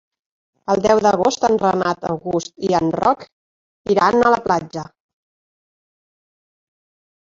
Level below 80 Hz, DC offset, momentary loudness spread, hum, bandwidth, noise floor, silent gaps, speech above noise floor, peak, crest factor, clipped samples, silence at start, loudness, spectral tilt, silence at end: -54 dBFS; under 0.1%; 15 LU; none; 7.8 kHz; under -90 dBFS; 3.32-3.85 s; over 73 dB; -2 dBFS; 18 dB; under 0.1%; 0.7 s; -18 LUFS; -5 dB/octave; 2.4 s